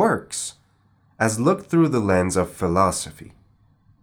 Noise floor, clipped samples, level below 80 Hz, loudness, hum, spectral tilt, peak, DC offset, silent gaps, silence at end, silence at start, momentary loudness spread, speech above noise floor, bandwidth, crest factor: -60 dBFS; under 0.1%; -54 dBFS; -21 LUFS; none; -5.5 dB/octave; -4 dBFS; under 0.1%; none; 0.75 s; 0 s; 10 LU; 39 dB; 19.5 kHz; 18 dB